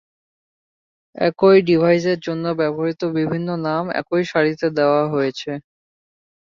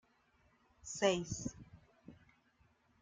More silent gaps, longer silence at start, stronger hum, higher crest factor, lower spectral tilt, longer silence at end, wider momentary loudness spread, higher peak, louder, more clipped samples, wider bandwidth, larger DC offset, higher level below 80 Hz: neither; first, 1.15 s vs 0.85 s; neither; second, 16 dB vs 26 dB; first, -7 dB/octave vs -4 dB/octave; about the same, 0.9 s vs 0.9 s; second, 9 LU vs 21 LU; first, -2 dBFS vs -18 dBFS; first, -19 LUFS vs -38 LUFS; neither; second, 7.2 kHz vs 9.6 kHz; neither; about the same, -62 dBFS vs -66 dBFS